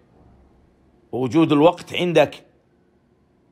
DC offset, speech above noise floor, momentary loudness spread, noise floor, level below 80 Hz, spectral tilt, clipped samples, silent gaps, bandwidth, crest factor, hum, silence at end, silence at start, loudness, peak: under 0.1%; 42 dB; 10 LU; -60 dBFS; -60 dBFS; -6.5 dB/octave; under 0.1%; none; 13.5 kHz; 18 dB; none; 1.15 s; 1.15 s; -18 LUFS; -4 dBFS